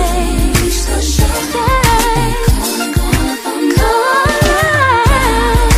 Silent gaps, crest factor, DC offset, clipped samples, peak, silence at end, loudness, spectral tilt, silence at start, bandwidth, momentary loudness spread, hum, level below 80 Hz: none; 12 dB; under 0.1%; under 0.1%; 0 dBFS; 0 s; -12 LUFS; -4.5 dB/octave; 0 s; 15.5 kHz; 5 LU; none; -16 dBFS